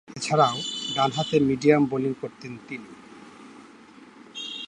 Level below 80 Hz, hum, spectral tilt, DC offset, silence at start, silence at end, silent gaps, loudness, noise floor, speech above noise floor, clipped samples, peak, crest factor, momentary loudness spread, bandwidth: -62 dBFS; none; -5 dB/octave; under 0.1%; 0.1 s; 0 s; none; -23 LUFS; -49 dBFS; 25 dB; under 0.1%; -4 dBFS; 22 dB; 23 LU; 10.5 kHz